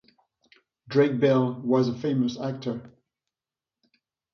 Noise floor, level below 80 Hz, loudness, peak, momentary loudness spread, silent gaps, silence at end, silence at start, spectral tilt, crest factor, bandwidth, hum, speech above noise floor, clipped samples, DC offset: under -90 dBFS; -68 dBFS; -25 LUFS; -8 dBFS; 12 LU; none; 1.45 s; 0.9 s; -8 dB/octave; 18 dB; 6.6 kHz; none; over 66 dB; under 0.1%; under 0.1%